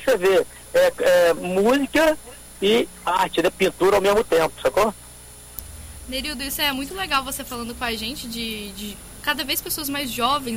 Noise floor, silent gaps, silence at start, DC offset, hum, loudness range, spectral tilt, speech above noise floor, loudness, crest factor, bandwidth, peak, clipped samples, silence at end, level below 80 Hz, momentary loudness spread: -42 dBFS; none; 0 s; under 0.1%; none; 6 LU; -3 dB/octave; 21 dB; -21 LUFS; 16 dB; 17 kHz; -6 dBFS; under 0.1%; 0 s; -44 dBFS; 16 LU